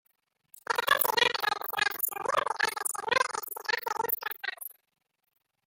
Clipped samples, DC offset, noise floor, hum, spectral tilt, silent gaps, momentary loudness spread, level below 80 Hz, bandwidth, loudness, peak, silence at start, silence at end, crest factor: under 0.1%; under 0.1%; -51 dBFS; none; 0.5 dB/octave; none; 11 LU; -76 dBFS; 17 kHz; -29 LUFS; -8 dBFS; 0.55 s; 0.95 s; 24 dB